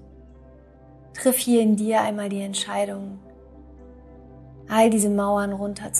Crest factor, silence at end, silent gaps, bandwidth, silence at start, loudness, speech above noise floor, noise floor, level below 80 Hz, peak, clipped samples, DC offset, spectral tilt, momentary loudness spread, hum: 18 dB; 0 s; none; 15 kHz; 0 s; -22 LUFS; 27 dB; -49 dBFS; -52 dBFS; -6 dBFS; under 0.1%; under 0.1%; -4 dB/octave; 14 LU; none